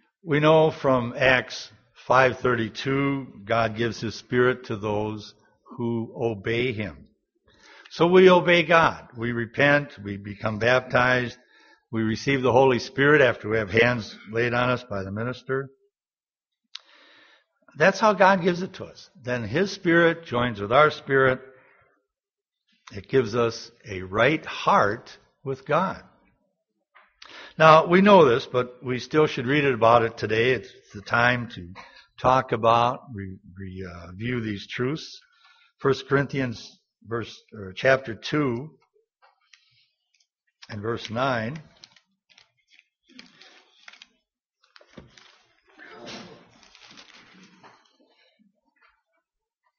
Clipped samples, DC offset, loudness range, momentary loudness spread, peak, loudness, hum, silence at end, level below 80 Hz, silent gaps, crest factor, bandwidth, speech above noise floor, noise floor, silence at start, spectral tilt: under 0.1%; under 0.1%; 11 LU; 21 LU; -2 dBFS; -22 LUFS; none; 3.5 s; -58 dBFS; 44.46-44.50 s; 22 dB; 7 kHz; over 67 dB; under -90 dBFS; 0.25 s; -4 dB/octave